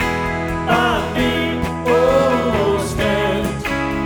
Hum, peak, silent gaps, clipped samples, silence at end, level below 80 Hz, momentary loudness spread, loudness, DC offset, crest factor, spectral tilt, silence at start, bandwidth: none; 0 dBFS; none; under 0.1%; 0 s; -34 dBFS; 6 LU; -18 LUFS; under 0.1%; 18 dB; -5.5 dB/octave; 0 s; over 20 kHz